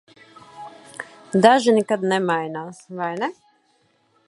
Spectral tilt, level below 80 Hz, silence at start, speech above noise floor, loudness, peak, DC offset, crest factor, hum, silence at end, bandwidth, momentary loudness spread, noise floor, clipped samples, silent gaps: -5 dB/octave; -72 dBFS; 0.55 s; 44 dB; -20 LUFS; 0 dBFS; under 0.1%; 22 dB; none; 0.95 s; 11.5 kHz; 23 LU; -63 dBFS; under 0.1%; none